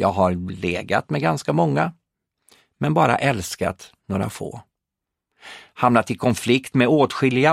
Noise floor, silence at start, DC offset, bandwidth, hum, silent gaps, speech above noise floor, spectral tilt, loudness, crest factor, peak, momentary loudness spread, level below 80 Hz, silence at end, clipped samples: -84 dBFS; 0 s; under 0.1%; 15.5 kHz; none; none; 64 dB; -6 dB/octave; -21 LUFS; 20 dB; 0 dBFS; 16 LU; -54 dBFS; 0 s; under 0.1%